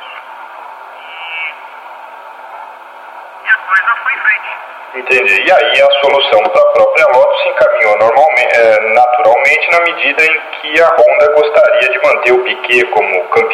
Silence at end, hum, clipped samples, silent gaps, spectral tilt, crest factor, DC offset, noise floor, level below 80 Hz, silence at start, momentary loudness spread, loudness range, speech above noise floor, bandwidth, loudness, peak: 0 s; none; 0.1%; none; -2.5 dB/octave; 10 dB; under 0.1%; -31 dBFS; -56 dBFS; 0 s; 22 LU; 9 LU; 22 dB; 12.5 kHz; -9 LUFS; 0 dBFS